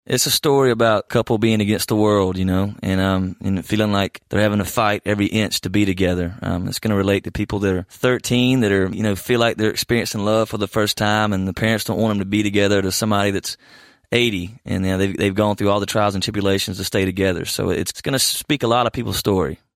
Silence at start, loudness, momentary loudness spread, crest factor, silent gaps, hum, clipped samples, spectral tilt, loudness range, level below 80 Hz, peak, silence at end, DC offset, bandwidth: 0.1 s; -19 LUFS; 5 LU; 16 dB; none; none; under 0.1%; -4.5 dB/octave; 2 LU; -46 dBFS; -2 dBFS; 0.25 s; under 0.1%; 16 kHz